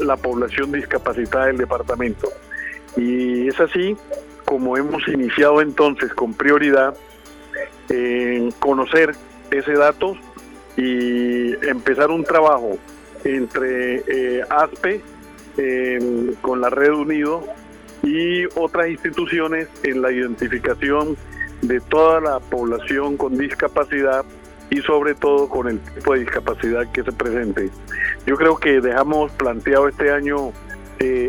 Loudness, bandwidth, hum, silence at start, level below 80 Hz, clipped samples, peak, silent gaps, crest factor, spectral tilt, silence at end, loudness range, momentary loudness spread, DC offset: -19 LUFS; 18.5 kHz; none; 0 s; -42 dBFS; under 0.1%; -4 dBFS; none; 16 dB; -6 dB/octave; 0 s; 3 LU; 11 LU; under 0.1%